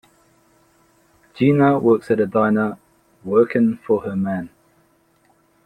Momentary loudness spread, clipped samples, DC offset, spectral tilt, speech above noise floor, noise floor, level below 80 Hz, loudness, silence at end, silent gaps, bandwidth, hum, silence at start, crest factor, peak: 13 LU; under 0.1%; under 0.1%; -9 dB/octave; 42 dB; -59 dBFS; -60 dBFS; -18 LUFS; 1.2 s; none; 10 kHz; none; 1.35 s; 18 dB; -2 dBFS